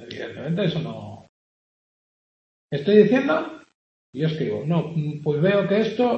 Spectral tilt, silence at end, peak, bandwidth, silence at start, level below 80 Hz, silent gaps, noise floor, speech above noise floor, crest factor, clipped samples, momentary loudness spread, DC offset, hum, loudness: -8 dB/octave; 0 s; -2 dBFS; 6.6 kHz; 0 s; -66 dBFS; 1.29-2.69 s, 3.75-4.13 s; under -90 dBFS; over 69 dB; 20 dB; under 0.1%; 17 LU; under 0.1%; none; -22 LUFS